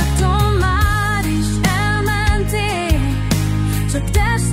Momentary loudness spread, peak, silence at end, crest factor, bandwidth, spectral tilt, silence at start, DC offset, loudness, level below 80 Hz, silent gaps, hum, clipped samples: 3 LU; 0 dBFS; 0 s; 16 dB; 16.5 kHz; -5 dB/octave; 0 s; under 0.1%; -17 LUFS; -20 dBFS; none; none; under 0.1%